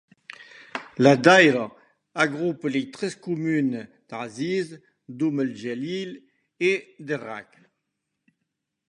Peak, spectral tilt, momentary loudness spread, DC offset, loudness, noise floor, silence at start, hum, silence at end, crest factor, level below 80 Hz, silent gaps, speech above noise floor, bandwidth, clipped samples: -2 dBFS; -5.5 dB/octave; 21 LU; under 0.1%; -23 LUFS; -80 dBFS; 0.4 s; none; 1.45 s; 24 dB; -70 dBFS; none; 57 dB; 11 kHz; under 0.1%